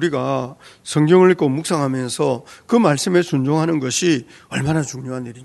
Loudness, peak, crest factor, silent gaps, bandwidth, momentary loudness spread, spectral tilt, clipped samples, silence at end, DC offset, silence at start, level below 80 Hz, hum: -18 LUFS; 0 dBFS; 18 dB; none; 12 kHz; 14 LU; -5.5 dB/octave; under 0.1%; 0 s; under 0.1%; 0 s; -56 dBFS; none